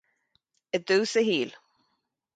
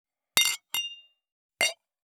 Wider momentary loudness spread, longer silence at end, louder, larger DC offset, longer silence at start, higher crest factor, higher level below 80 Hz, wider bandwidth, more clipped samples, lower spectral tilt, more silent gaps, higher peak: about the same, 9 LU vs 8 LU; first, 0.85 s vs 0.4 s; about the same, -26 LUFS vs -27 LUFS; neither; first, 0.75 s vs 0.35 s; second, 18 dB vs 30 dB; about the same, -76 dBFS vs -76 dBFS; second, 9.4 kHz vs over 20 kHz; neither; first, -3.5 dB/octave vs 2 dB/octave; second, none vs 1.32-1.49 s; second, -12 dBFS vs -2 dBFS